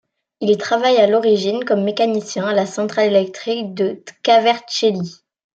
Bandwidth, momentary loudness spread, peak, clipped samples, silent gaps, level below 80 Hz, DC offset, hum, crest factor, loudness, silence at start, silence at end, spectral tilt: 8.8 kHz; 10 LU; -2 dBFS; under 0.1%; none; -68 dBFS; under 0.1%; none; 16 dB; -17 LUFS; 0.4 s; 0.4 s; -4.5 dB/octave